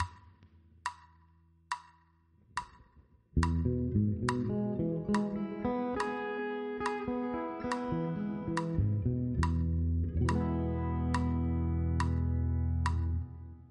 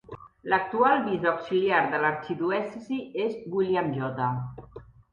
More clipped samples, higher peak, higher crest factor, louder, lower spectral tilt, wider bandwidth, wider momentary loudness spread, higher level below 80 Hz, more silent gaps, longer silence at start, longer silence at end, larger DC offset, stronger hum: neither; second, -14 dBFS vs -8 dBFS; about the same, 18 dB vs 20 dB; second, -34 LUFS vs -27 LUFS; about the same, -7.5 dB/octave vs -8 dB/octave; first, 10.5 kHz vs 7 kHz; about the same, 11 LU vs 12 LU; first, -42 dBFS vs -62 dBFS; neither; about the same, 0 s vs 0.1 s; second, 0.05 s vs 0.3 s; neither; neither